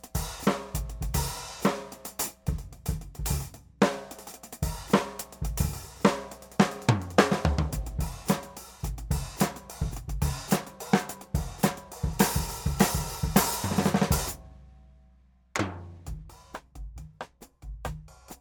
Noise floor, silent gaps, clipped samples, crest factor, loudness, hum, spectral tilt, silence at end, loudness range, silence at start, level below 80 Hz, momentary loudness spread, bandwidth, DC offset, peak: -59 dBFS; none; under 0.1%; 24 dB; -29 LUFS; none; -5 dB/octave; 0.05 s; 6 LU; 0.05 s; -38 dBFS; 18 LU; over 20 kHz; under 0.1%; -6 dBFS